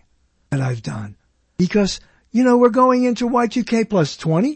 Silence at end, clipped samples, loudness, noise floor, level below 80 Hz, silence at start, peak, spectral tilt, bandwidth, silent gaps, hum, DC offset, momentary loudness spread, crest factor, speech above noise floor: 0 s; under 0.1%; -18 LUFS; -61 dBFS; -48 dBFS; 0.5 s; 0 dBFS; -6.5 dB/octave; 8.8 kHz; none; none; under 0.1%; 16 LU; 18 dB; 44 dB